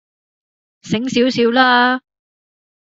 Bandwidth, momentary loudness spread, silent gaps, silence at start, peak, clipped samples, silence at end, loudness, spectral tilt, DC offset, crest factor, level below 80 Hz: 7.8 kHz; 11 LU; none; 0.85 s; -2 dBFS; under 0.1%; 0.95 s; -15 LUFS; -4.5 dB/octave; under 0.1%; 16 dB; -60 dBFS